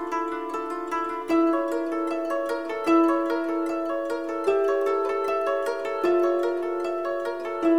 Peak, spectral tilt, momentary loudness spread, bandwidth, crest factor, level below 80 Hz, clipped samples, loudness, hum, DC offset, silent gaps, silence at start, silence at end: -10 dBFS; -4.5 dB/octave; 7 LU; 13.5 kHz; 16 dB; -64 dBFS; under 0.1%; -25 LUFS; none; 0.3%; none; 0 s; 0 s